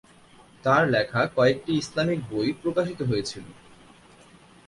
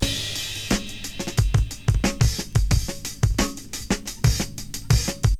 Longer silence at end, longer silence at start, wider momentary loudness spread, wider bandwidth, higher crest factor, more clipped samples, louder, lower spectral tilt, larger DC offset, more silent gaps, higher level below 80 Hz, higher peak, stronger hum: first, 1.15 s vs 0 s; first, 0.65 s vs 0 s; about the same, 8 LU vs 8 LU; second, 11.5 kHz vs 16 kHz; about the same, 18 dB vs 18 dB; neither; about the same, -25 LUFS vs -24 LUFS; first, -6 dB/octave vs -4.5 dB/octave; second, under 0.1% vs 0.6%; neither; second, -58 dBFS vs -28 dBFS; about the same, -8 dBFS vs -6 dBFS; neither